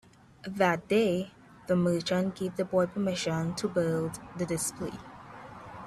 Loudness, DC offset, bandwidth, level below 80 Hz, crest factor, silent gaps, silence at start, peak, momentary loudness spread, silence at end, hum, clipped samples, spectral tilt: -30 LUFS; under 0.1%; 14.5 kHz; -62 dBFS; 20 dB; none; 0.45 s; -10 dBFS; 19 LU; 0 s; none; under 0.1%; -5.5 dB/octave